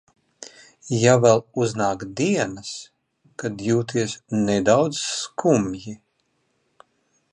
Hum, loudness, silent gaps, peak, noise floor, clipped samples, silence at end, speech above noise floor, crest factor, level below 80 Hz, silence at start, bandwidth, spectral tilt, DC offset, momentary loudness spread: none; -21 LUFS; none; -2 dBFS; -70 dBFS; under 0.1%; 1.35 s; 49 dB; 22 dB; -58 dBFS; 0.4 s; 11 kHz; -5 dB/octave; under 0.1%; 23 LU